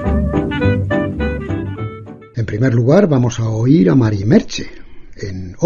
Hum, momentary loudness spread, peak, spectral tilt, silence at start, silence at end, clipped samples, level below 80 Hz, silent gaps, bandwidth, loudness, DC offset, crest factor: none; 16 LU; 0 dBFS; -7.5 dB/octave; 0 s; 0 s; under 0.1%; -30 dBFS; none; 7.2 kHz; -15 LUFS; under 0.1%; 16 dB